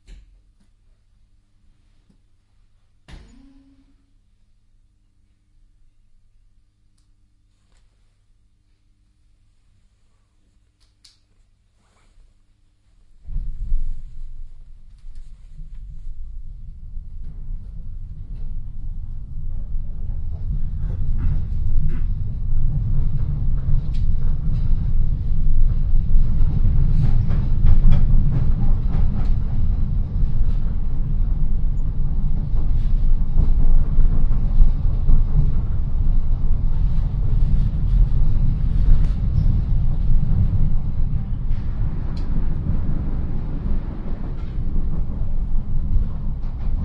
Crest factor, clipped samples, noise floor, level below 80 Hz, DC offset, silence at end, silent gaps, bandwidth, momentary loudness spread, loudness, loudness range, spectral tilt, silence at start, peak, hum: 16 dB; under 0.1%; -59 dBFS; -20 dBFS; under 0.1%; 0 s; none; 1.7 kHz; 17 LU; -24 LUFS; 16 LU; -10 dB/octave; 0.1 s; 0 dBFS; none